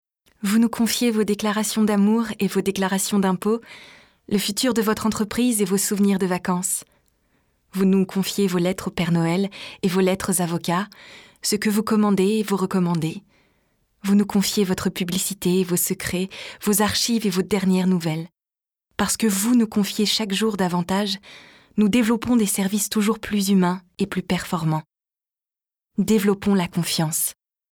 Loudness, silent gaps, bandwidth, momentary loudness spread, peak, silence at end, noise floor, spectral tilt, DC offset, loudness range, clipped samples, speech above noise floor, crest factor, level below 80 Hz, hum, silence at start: -21 LUFS; none; over 20 kHz; 8 LU; -4 dBFS; 0.4 s; under -90 dBFS; -4.5 dB/octave; under 0.1%; 2 LU; under 0.1%; over 69 dB; 18 dB; -54 dBFS; none; 0.4 s